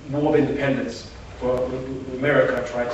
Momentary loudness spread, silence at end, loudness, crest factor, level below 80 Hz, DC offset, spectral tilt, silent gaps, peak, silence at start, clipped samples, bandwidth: 12 LU; 0 s; -23 LUFS; 18 dB; -44 dBFS; under 0.1%; -6.5 dB/octave; none; -4 dBFS; 0 s; under 0.1%; 8.4 kHz